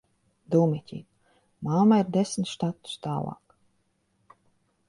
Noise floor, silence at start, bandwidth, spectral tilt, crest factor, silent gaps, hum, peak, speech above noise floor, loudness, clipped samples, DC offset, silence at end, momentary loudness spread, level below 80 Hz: -72 dBFS; 0.5 s; 11.5 kHz; -7 dB/octave; 20 dB; none; none; -8 dBFS; 47 dB; -26 LUFS; under 0.1%; under 0.1%; 1.55 s; 16 LU; -66 dBFS